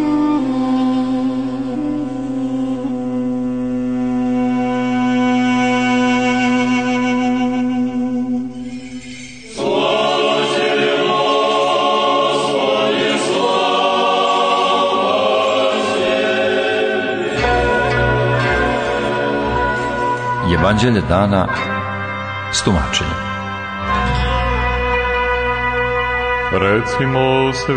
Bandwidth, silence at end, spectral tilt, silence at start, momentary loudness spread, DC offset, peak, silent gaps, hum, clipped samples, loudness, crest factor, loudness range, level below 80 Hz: 9.6 kHz; 0 s; -5 dB/octave; 0 s; 7 LU; under 0.1%; -2 dBFS; none; none; under 0.1%; -16 LUFS; 14 dB; 4 LU; -32 dBFS